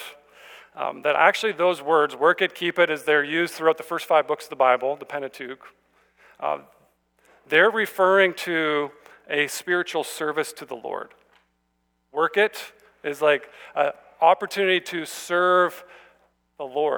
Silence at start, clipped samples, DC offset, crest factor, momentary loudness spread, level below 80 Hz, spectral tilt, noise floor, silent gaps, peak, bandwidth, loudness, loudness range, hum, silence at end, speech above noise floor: 0 s; under 0.1%; under 0.1%; 22 dB; 15 LU; -76 dBFS; -3.5 dB/octave; -71 dBFS; none; -2 dBFS; over 20 kHz; -22 LUFS; 6 LU; none; 0 s; 49 dB